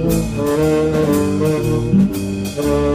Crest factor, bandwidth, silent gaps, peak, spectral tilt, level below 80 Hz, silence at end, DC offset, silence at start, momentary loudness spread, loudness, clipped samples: 12 dB; 16 kHz; none; -4 dBFS; -7 dB/octave; -32 dBFS; 0 s; under 0.1%; 0 s; 4 LU; -17 LUFS; under 0.1%